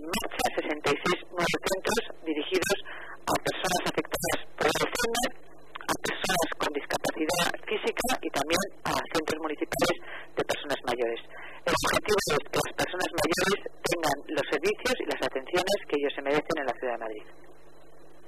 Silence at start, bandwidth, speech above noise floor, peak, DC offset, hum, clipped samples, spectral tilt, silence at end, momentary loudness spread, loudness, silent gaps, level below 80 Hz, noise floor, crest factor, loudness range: 0 s; 15.5 kHz; 27 dB; -10 dBFS; 0.7%; none; under 0.1%; -3 dB/octave; 0.75 s; 6 LU; -29 LUFS; none; -52 dBFS; -55 dBFS; 18 dB; 2 LU